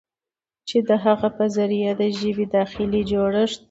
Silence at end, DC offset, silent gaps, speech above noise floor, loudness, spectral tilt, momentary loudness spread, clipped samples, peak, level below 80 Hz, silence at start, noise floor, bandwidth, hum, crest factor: 0.15 s; under 0.1%; none; over 69 dB; -21 LUFS; -6.5 dB/octave; 4 LU; under 0.1%; -4 dBFS; -50 dBFS; 0.65 s; under -90 dBFS; 8 kHz; none; 16 dB